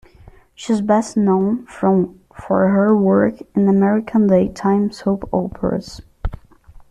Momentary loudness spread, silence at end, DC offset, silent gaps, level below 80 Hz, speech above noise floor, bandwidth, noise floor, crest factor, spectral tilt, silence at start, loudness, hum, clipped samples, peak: 13 LU; 0.55 s; under 0.1%; none; -40 dBFS; 29 dB; 10 kHz; -45 dBFS; 14 dB; -8 dB/octave; 0.6 s; -17 LUFS; none; under 0.1%; -4 dBFS